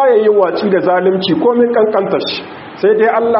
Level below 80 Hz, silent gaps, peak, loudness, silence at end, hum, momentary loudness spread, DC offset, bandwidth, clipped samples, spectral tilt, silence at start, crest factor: -58 dBFS; none; 0 dBFS; -12 LUFS; 0 s; none; 7 LU; under 0.1%; 5.8 kHz; under 0.1%; -3.5 dB/octave; 0 s; 12 dB